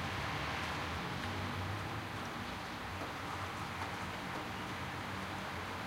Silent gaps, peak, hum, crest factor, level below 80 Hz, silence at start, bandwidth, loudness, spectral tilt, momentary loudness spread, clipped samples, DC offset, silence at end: none; -26 dBFS; none; 14 dB; -56 dBFS; 0 s; 16 kHz; -41 LUFS; -4.5 dB/octave; 4 LU; under 0.1%; under 0.1%; 0 s